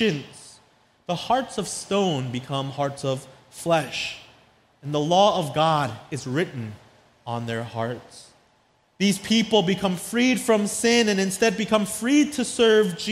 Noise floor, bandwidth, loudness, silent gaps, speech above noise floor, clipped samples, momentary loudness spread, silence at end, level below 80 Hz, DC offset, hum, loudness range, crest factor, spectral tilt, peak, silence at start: -63 dBFS; 15.5 kHz; -23 LUFS; none; 40 dB; under 0.1%; 14 LU; 0 s; -60 dBFS; under 0.1%; none; 7 LU; 18 dB; -4.5 dB/octave; -6 dBFS; 0 s